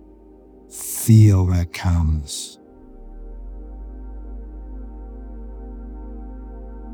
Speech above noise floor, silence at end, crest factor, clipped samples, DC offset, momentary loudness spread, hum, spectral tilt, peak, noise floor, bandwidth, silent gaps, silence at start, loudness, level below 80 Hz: 30 dB; 0 s; 20 dB; under 0.1%; under 0.1%; 24 LU; none; -6.5 dB/octave; -2 dBFS; -46 dBFS; over 20 kHz; none; 0.75 s; -18 LUFS; -34 dBFS